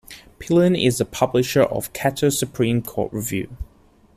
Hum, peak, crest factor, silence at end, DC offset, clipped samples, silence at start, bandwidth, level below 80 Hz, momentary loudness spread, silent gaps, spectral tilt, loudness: none; -4 dBFS; 18 dB; 0.5 s; under 0.1%; under 0.1%; 0.1 s; 15.5 kHz; -44 dBFS; 14 LU; none; -5 dB/octave; -20 LUFS